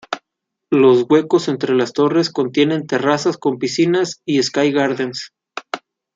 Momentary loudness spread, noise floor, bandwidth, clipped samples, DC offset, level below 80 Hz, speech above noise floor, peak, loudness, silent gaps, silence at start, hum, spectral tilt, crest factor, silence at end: 15 LU; -80 dBFS; 7.8 kHz; under 0.1%; under 0.1%; -64 dBFS; 64 dB; -2 dBFS; -17 LUFS; none; 0.1 s; none; -5 dB/octave; 16 dB; 0.4 s